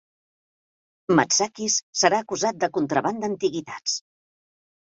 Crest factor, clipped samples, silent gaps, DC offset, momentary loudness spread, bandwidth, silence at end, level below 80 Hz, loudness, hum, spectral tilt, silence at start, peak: 22 dB; under 0.1%; 1.83-1.93 s; under 0.1%; 8 LU; 8.2 kHz; 0.9 s; -68 dBFS; -23 LUFS; none; -2.5 dB/octave; 1.1 s; -4 dBFS